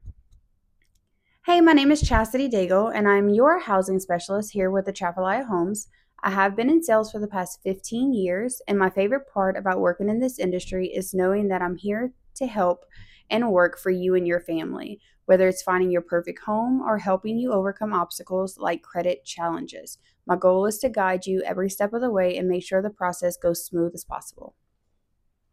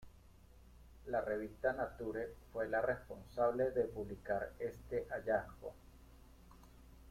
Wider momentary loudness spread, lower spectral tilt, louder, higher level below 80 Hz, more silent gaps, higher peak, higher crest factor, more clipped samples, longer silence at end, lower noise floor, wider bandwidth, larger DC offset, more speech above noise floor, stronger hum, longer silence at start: about the same, 10 LU vs 10 LU; second, -5.5 dB/octave vs -7 dB/octave; first, -23 LUFS vs -40 LUFS; first, -44 dBFS vs -60 dBFS; neither; first, -4 dBFS vs -20 dBFS; about the same, 20 dB vs 20 dB; neither; first, 1.05 s vs 0 s; first, -71 dBFS vs -62 dBFS; about the same, 15.5 kHz vs 16 kHz; neither; first, 48 dB vs 22 dB; neither; about the same, 0.05 s vs 0 s